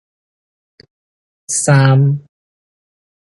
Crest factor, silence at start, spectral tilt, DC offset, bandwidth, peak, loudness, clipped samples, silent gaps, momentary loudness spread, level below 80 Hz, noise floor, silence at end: 16 dB; 1.5 s; -5.5 dB/octave; under 0.1%; 11.5 kHz; 0 dBFS; -13 LUFS; under 0.1%; none; 10 LU; -58 dBFS; under -90 dBFS; 1.05 s